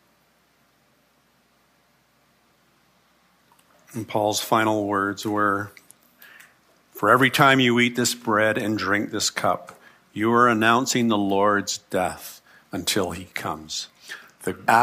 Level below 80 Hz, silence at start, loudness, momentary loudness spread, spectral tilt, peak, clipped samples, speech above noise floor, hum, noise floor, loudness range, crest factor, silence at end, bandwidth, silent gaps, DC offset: -66 dBFS; 3.95 s; -22 LUFS; 17 LU; -3.5 dB/octave; -2 dBFS; under 0.1%; 41 dB; none; -63 dBFS; 7 LU; 22 dB; 0 s; 15.5 kHz; none; under 0.1%